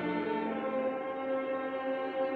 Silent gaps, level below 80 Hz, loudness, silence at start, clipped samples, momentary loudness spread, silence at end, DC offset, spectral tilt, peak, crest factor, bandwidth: none; -74 dBFS; -34 LUFS; 0 s; under 0.1%; 2 LU; 0 s; under 0.1%; -8 dB/octave; -22 dBFS; 12 dB; 4.7 kHz